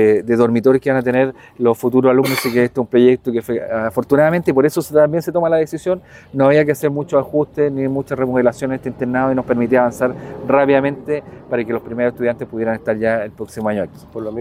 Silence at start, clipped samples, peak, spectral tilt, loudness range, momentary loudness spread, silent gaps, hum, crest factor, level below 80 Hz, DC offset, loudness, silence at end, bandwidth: 0 s; under 0.1%; 0 dBFS; -7 dB/octave; 3 LU; 9 LU; none; none; 16 dB; -52 dBFS; under 0.1%; -17 LUFS; 0 s; 16.5 kHz